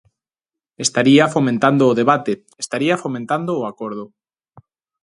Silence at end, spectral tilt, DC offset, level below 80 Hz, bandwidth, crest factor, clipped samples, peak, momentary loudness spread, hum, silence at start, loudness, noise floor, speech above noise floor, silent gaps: 0.95 s; -5 dB/octave; under 0.1%; -64 dBFS; 11.5 kHz; 18 dB; under 0.1%; 0 dBFS; 13 LU; none; 0.8 s; -17 LUFS; -88 dBFS; 71 dB; none